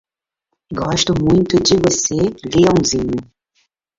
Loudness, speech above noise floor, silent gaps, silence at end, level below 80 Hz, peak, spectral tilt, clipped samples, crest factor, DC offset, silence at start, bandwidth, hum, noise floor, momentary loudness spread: -15 LUFS; 60 dB; none; 0.75 s; -40 dBFS; -2 dBFS; -4.5 dB/octave; under 0.1%; 16 dB; under 0.1%; 0.7 s; 7.8 kHz; none; -75 dBFS; 10 LU